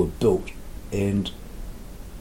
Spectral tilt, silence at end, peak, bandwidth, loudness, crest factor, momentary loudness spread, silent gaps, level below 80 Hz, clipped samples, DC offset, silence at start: -7 dB/octave; 0 s; -8 dBFS; 17 kHz; -25 LUFS; 18 dB; 19 LU; none; -38 dBFS; under 0.1%; under 0.1%; 0 s